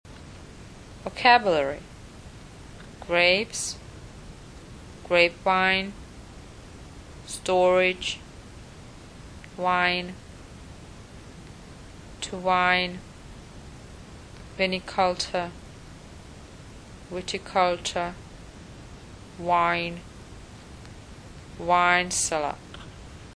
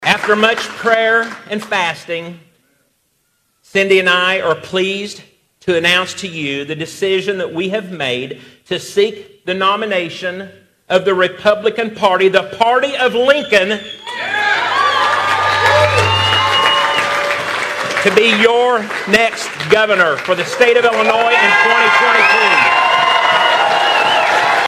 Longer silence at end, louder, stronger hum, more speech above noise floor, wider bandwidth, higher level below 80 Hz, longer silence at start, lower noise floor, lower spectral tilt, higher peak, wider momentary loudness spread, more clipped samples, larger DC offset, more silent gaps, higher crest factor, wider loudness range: about the same, 0.05 s vs 0 s; second, -24 LUFS vs -13 LUFS; neither; second, 21 dB vs 49 dB; second, 11 kHz vs 15 kHz; first, -50 dBFS vs -56 dBFS; about the same, 0.05 s vs 0 s; second, -45 dBFS vs -63 dBFS; about the same, -3 dB/octave vs -3.5 dB/octave; second, -4 dBFS vs 0 dBFS; first, 25 LU vs 12 LU; neither; neither; neither; first, 26 dB vs 14 dB; about the same, 6 LU vs 8 LU